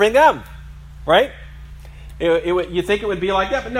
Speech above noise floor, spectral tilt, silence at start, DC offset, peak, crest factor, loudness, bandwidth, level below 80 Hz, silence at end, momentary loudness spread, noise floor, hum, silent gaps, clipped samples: 20 dB; -5 dB/octave; 0 s; under 0.1%; 0 dBFS; 18 dB; -18 LUFS; 16 kHz; -38 dBFS; 0 s; 24 LU; -36 dBFS; none; none; under 0.1%